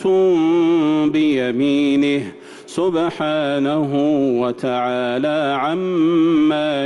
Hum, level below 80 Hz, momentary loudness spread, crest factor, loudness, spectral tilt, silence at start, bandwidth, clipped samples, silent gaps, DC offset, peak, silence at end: none; -60 dBFS; 5 LU; 8 dB; -17 LUFS; -6.5 dB/octave; 0 s; 11 kHz; under 0.1%; none; under 0.1%; -8 dBFS; 0 s